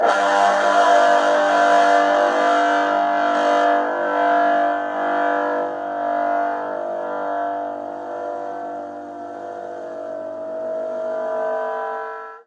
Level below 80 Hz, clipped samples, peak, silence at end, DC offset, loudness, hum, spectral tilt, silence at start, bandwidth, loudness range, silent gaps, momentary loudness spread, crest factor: -80 dBFS; under 0.1%; -4 dBFS; 0.05 s; under 0.1%; -19 LUFS; none; -3 dB/octave; 0 s; 10.5 kHz; 12 LU; none; 15 LU; 16 dB